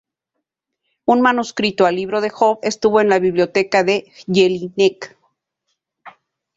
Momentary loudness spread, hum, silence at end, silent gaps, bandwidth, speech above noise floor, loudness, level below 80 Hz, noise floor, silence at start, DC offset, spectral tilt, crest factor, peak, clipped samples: 7 LU; none; 0.5 s; none; 7.8 kHz; 62 dB; -17 LUFS; -60 dBFS; -78 dBFS; 1.1 s; under 0.1%; -5 dB/octave; 16 dB; -2 dBFS; under 0.1%